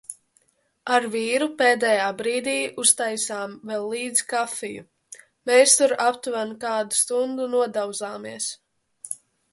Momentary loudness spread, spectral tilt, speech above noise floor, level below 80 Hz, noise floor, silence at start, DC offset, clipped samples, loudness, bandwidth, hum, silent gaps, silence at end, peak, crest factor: 17 LU; -1 dB/octave; 42 dB; -74 dBFS; -65 dBFS; 0.1 s; under 0.1%; under 0.1%; -22 LUFS; 12 kHz; none; none; 0.4 s; -2 dBFS; 22 dB